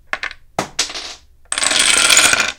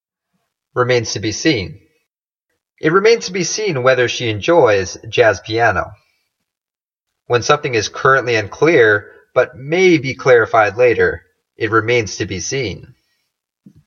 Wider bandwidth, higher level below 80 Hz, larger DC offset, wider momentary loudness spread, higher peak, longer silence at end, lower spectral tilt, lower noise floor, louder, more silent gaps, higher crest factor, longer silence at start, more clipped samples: first, over 20 kHz vs 7.4 kHz; about the same, -46 dBFS vs -50 dBFS; neither; first, 17 LU vs 10 LU; about the same, 0 dBFS vs 0 dBFS; second, 0.05 s vs 1.05 s; second, 1 dB/octave vs -4.5 dB/octave; second, -35 dBFS vs under -90 dBFS; first, -12 LUFS vs -15 LUFS; neither; about the same, 16 dB vs 16 dB; second, 0.15 s vs 0.75 s; neither